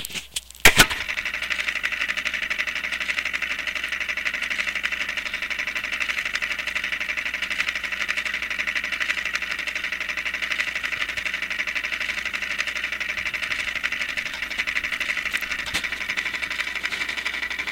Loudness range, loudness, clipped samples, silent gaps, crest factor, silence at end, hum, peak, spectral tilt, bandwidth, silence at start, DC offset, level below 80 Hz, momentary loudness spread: 2 LU; -24 LUFS; under 0.1%; none; 24 dB; 0 s; none; -2 dBFS; -1 dB/octave; 17 kHz; 0 s; under 0.1%; -44 dBFS; 2 LU